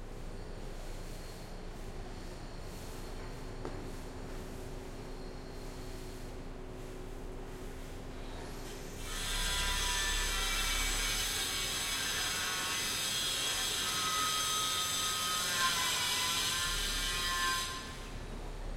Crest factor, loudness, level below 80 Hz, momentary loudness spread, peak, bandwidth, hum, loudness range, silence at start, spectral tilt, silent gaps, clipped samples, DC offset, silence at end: 18 dB; -32 LUFS; -44 dBFS; 16 LU; -18 dBFS; 16.5 kHz; none; 16 LU; 0 s; -1 dB/octave; none; under 0.1%; under 0.1%; 0 s